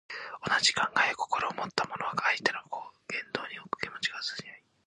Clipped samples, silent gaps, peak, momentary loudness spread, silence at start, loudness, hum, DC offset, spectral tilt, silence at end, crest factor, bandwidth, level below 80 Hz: under 0.1%; none; -8 dBFS; 15 LU; 0.1 s; -30 LUFS; none; under 0.1%; -1.5 dB/octave; 0.3 s; 24 dB; 10 kHz; -70 dBFS